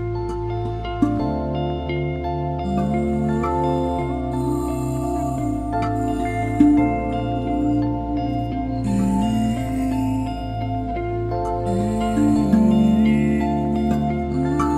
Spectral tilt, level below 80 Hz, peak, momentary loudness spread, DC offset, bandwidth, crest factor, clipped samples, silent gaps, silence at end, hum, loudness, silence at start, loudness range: -8 dB/octave; -32 dBFS; -2 dBFS; 8 LU; under 0.1%; 13.5 kHz; 18 dB; under 0.1%; none; 0 s; none; -21 LUFS; 0 s; 4 LU